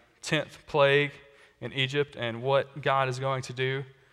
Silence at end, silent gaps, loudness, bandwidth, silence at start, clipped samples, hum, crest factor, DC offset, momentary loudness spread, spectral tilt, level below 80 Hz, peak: 0.2 s; none; -28 LUFS; 12.5 kHz; 0.25 s; under 0.1%; none; 20 dB; under 0.1%; 9 LU; -5 dB/octave; -66 dBFS; -10 dBFS